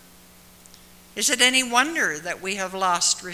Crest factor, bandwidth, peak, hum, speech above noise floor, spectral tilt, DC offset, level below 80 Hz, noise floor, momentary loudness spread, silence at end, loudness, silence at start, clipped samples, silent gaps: 24 dB; 16 kHz; 0 dBFS; 60 Hz at -50 dBFS; 28 dB; -0.5 dB/octave; under 0.1%; -60 dBFS; -50 dBFS; 11 LU; 0 s; -21 LUFS; 1.15 s; under 0.1%; none